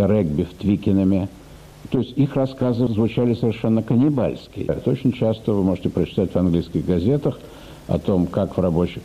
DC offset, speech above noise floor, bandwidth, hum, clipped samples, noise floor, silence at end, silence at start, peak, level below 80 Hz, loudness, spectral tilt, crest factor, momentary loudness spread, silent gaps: under 0.1%; 21 dB; 13.5 kHz; none; under 0.1%; -41 dBFS; 0 s; 0 s; -8 dBFS; -42 dBFS; -21 LUFS; -9 dB/octave; 12 dB; 7 LU; none